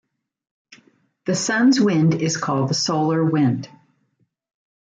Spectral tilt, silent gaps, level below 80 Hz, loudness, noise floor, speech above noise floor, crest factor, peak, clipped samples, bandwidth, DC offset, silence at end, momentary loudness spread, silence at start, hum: -5 dB/octave; none; -64 dBFS; -19 LUFS; -68 dBFS; 49 dB; 14 dB; -6 dBFS; under 0.1%; 9.4 kHz; under 0.1%; 1.2 s; 10 LU; 1.25 s; none